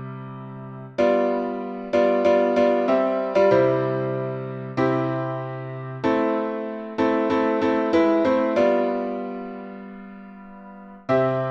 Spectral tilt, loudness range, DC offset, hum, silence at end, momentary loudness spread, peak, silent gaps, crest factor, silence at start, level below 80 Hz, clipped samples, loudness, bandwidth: -8 dB/octave; 5 LU; under 0.1%; none; 0 s; 18 LU; -6 dBFS; none; 16 dB; 0 s; -60 dBFS; under 0.1%; -22 LUFS; 7.6 kHz